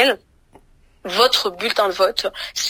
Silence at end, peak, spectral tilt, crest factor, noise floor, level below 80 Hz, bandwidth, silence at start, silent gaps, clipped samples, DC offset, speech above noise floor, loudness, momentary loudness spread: 0 s; -2 dBFS; -1 dB/octave; 20 dB; -52 dBFS; -56 dBFS; 16 kHz; 0 s; none; under 0.1%; under 0.1%; 33 dB; -18 LUFS; 10 LU